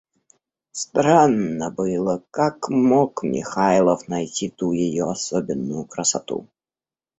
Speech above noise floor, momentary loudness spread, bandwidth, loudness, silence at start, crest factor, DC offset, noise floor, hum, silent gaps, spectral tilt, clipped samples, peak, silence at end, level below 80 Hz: over 70 dB; 10 LU; 8.4 kHz; -21 LUFS; 0.75 s; 20 dB; under 0.1%; under -90 dBFS; none; none; -5 dB/octave; under 0.1%; -2 dBFS; 0.75 s; -58 dBFS